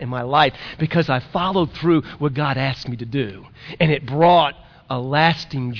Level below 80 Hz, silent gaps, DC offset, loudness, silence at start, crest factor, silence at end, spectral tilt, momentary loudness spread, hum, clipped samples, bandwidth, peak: -48 dBFS; none; under 0.1%; -19 LUFS; 0 s; 18 dB; 0 s; -7.5 dB/octave; 11 LU; none; under 0.1%; 5.4 kHz; -2 dBFS